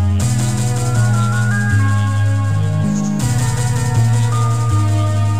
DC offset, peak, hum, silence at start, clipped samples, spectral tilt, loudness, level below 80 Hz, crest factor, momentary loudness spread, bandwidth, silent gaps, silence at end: 3%; -4 dBFS; none; 0 s; under 0.1%; -6 dB/octave; -16 LUFS; -34 dBFS; 10 dB; 2 LU; 15.5 kHz; none; 0 s